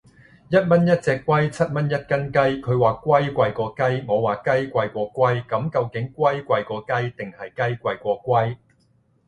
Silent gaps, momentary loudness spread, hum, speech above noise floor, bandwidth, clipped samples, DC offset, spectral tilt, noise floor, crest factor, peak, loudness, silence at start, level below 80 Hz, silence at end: none; 8 LU; none; 41 dB; 11 kHz; under 0.1%; under 0.1%; -7.5 dB/octave; -62 dBFS; 18 dB; -2 dBFS; -22 LUFS; 0.5 s; -54 dBFS; 0.75 s